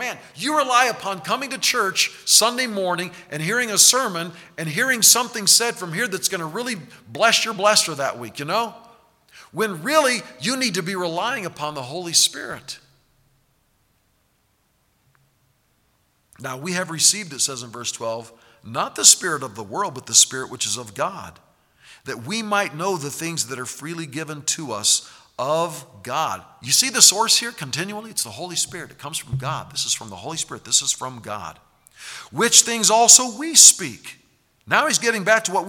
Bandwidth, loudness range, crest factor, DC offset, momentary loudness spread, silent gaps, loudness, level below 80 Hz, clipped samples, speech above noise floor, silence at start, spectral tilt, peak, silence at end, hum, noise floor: 19 kHz; 11 LU; 22 dB; under 0.1%; 19 LU; none; -18 LUFS; -64 dBFS; under 0.1%; 44 dB; 0 s; -1 dB/octave; 0 dBFS; 0 s; none; -65 dBFS